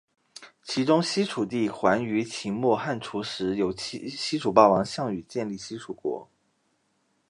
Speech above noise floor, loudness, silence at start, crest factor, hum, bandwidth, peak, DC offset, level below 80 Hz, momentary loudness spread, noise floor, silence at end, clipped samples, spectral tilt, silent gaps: 46 dB; -26 LUFS; 0.4 s; 24 dB; none; 11 kHz; -4 dBFS; under 0.1%; -62 dBFS; 13 LU; -71 dBFS; 1.05 s; under 0.1%; -5 dB/octave; none